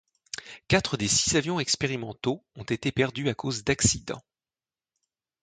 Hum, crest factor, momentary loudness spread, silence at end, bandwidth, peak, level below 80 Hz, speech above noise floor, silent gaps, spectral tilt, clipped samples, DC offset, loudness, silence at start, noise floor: none; 22 dB; 16 LU; 1.2 s; 9.6 kHz; -6 dBFS; -50 dBFS; over 63 dB; none; -3.5 dB/octave; under 0.1%; under 0.1%; -26 LUFS; 0.35 s; under -90 dBFS